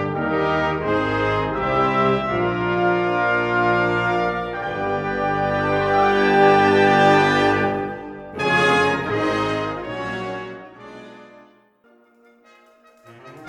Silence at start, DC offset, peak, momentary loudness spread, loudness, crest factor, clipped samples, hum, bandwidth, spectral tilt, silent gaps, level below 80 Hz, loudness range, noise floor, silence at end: 0 s; under 0.1%; -4 dBFS; 14 LU; -19 LUFS; 18 dB; under 0.1%; none; 11.5 kHz; -6 dB/octave; none; -46 dBFS; 12 LU; -56 dBFS; 0 s